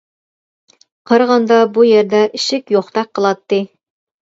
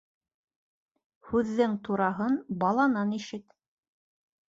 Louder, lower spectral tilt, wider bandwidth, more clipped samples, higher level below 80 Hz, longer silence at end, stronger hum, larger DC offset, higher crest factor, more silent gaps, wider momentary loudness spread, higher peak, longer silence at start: first, -14 LUFS vs -28 LUFS; second, -4.5 dB/octave vs -7 dB/octave; about the same, 8 kHz vs 7.8 kHz; neither; about the same, -66 dBFS vs -64 dBFS; second, 0.7 s vs 1.1 s; neither; neither; about the same, 14 dB vs 18 dB; neither; about the same, 9 LU vs 10 LU; first, 0 dBFS vs -12 dBFS; second, 1.1 s vs 1.25 s